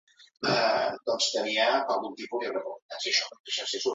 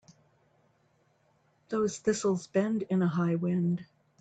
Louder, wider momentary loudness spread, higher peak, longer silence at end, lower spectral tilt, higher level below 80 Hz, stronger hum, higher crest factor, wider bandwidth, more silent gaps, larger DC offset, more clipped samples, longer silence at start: about the same, -28 LUFS vs -30 LUFS; first, 9 LU vs 4 LU; about the same, -12 dBFS vs -14 dBFS; second, 0 s vs 0.35 s; second, -2 dB/octave vs -6.5 dB/octave; about the same, -76 dBFS vs -72 dBFS; neither; about the same, 16 dB vs 16 dB; about the same, 8.2 kHz vs 9 kHz; first, 2.82-2.89 s, 3.40-3.44 s vs none; neither; neither; second, 0.2 s vs 1.7 s